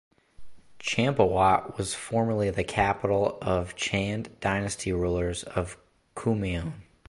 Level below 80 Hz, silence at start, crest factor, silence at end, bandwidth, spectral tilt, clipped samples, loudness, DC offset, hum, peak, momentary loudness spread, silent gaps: -44 dBFS; 0.4 s; 20 dB; 0.25 s; 11.5 kHz; -5 dB/octave; under 0.1%; -27 LUFS; under 0.1%; none; -8 dBFS; 9 LU; none